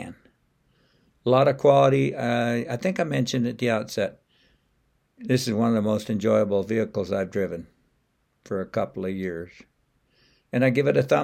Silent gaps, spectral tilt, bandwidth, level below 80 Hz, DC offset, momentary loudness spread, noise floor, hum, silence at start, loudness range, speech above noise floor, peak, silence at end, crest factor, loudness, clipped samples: none; -6.5 dB/octave; 16 kHz; -64 dBFS; under 0.1%; 13 LU; -70 dBFS; none; 0 s; 8 LU; 47 dB; -6 dBFS; 0 s; 20 dB; -24 LUFS; under 0.1%